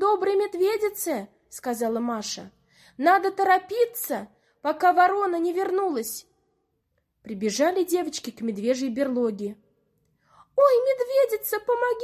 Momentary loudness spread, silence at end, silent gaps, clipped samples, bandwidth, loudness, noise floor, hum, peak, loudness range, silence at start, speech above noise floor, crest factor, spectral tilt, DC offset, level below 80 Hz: 13 LU; 0 s; none; under 0.1%; 16 kHz; -24 LUFS; -74 dBFS; none; -6 dBFS; 4 LU; 0 s; 50 dB; 18 dB; -3.5 dB/octave; under 0.1%; -70 dBFS